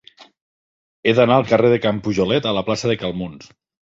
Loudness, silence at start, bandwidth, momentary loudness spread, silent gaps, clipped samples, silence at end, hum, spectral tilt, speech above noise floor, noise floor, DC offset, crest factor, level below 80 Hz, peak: -18 LUFS; 0.2 s; 7.8 kHz; 10 LU; 0.41-1.03 s; under 0.1%; 0.5 s; none; -6 dB/octave; over 72 dB; under -90 dBFS; under 0.1%; 18 dB; -50 dBFS; -2 dBFS